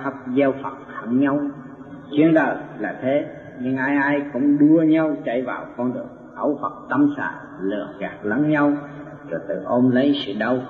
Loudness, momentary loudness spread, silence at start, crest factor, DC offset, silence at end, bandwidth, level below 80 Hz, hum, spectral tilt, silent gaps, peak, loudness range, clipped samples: -21 LUFS; 14 LU; 0 s; 16 dB; under 0.1%; 0 s; 5 kHz; -62 dBFS; none; -8.5 dB/octave; none; -6 dBFS; 4 LU; under 0.1%